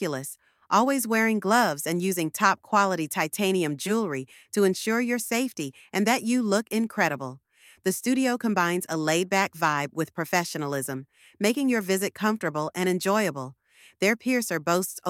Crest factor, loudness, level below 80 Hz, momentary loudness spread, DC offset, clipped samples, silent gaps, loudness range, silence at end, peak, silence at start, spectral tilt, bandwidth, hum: 18 dB; -25 LUFS; -74 dBFS; 8 LU; under 0.1%; under 0.1%; none; 3 LU; 0 s; -8 dBFS; 0 s; -4 dB/octave; 17 kHz; none